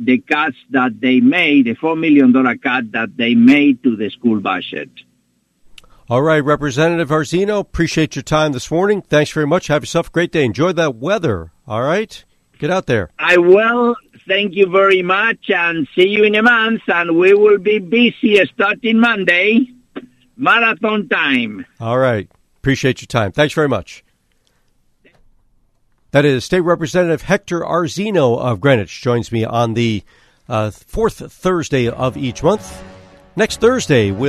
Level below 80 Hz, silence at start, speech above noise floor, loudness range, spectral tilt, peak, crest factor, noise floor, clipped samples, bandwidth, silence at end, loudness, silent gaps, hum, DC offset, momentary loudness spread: -44 dBFS; 0 s; 47 dB; 6 LU; -5.5 dB/octave; 0 dBFS; 16 dB; -61 dBFS; under 0.1%; 13 kHz; 0 s; -15 LUFS; none; none; under 0.1%; 9 LU